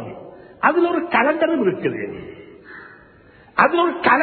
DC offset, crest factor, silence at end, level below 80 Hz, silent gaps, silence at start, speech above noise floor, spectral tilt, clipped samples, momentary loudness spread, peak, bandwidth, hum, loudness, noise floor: under 0.1%; 20 dB; 0 s; -58 dBFS; none; 0 s; 31 dB; -9 dB/octave; under 0.1%; 23 LU; 0 dBFS; 4.5 kHz; none; -18 LUFS; -49 dBFS